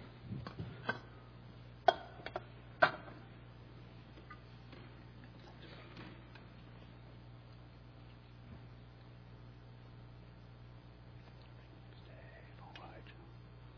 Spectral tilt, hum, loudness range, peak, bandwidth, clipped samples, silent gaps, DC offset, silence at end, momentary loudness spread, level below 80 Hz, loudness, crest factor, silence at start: -3 dB/octave; 60 Hz at -55 dBFS; 17 LU; -12 dBFS; 5.4 kHz; under 0.1%; none; under 0.1%; 0 s; 22 LU; -62 dBFS; -42 LUFS; 34 dB; 0 s